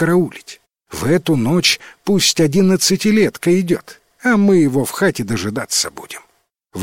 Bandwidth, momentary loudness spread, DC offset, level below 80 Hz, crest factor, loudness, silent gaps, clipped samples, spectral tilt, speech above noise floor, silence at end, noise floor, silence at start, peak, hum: 16.5 kHz; 12 LU; 0.5%; -50 dBFS; 16 dB; -16 LUFS; none; under 0.1%; -4.5 dB/octave; 45 dB; 0 s; -60 dBFS; 0 s; -2 dBFS; none